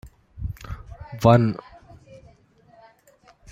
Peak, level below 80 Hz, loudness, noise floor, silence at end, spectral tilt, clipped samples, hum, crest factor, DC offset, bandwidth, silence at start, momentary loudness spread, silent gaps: -2 dBFS; -44 dBFS; -21 LUFS; -56 dBFS; 1.95 s; -8 dB/octave; under 0.1%; none; 24 dB; under 0.1%; 14.5 kHz; 0.4 s; 22 LU; none